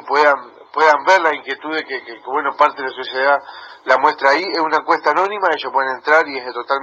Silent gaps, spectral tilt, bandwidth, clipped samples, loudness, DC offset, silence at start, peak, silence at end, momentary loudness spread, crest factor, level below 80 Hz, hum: none; -2.5 dB/octave; 7.8 kHz; under 0.1%; -16 LUFS; under 0.1%; 0 s; 0 dBFS; 0 s; 11 LU; 16 dB; -72 dBFS; none